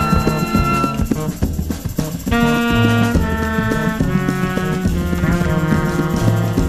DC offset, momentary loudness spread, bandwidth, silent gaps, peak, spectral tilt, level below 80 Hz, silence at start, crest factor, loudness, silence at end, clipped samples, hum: 0.5%; 7 LU; 15.5 kHz; none; -2 dBFS; -6.5 dB/octave; -26 dBFS; 0 s; 14 dB; -17 LUFS; 0 s; under 0.1%; none